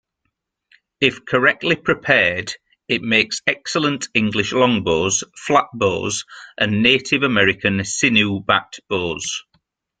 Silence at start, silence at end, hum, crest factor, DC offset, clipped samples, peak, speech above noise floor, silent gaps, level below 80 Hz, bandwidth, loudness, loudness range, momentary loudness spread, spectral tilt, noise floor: 1 s; 0.6 s; none; 20 dB; under 0.1%; under 0.1%; 0 dBFS; 56 dB; none; -54 dBFS; 9.6 kHz; -18 LUFS; 2 LU; 10 LU; -3.5 dB/octave; -75 dBFS